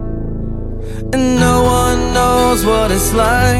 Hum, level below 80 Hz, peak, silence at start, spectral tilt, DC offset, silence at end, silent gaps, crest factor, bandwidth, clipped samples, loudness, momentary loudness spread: none; -22 dBFS; 0 dBFS; 0 s; -5 dB/octave; under 0.1%; 0 s; none; 12 dB; 16.5 kHz; under 0.1%; -13 LUFS; 13 LU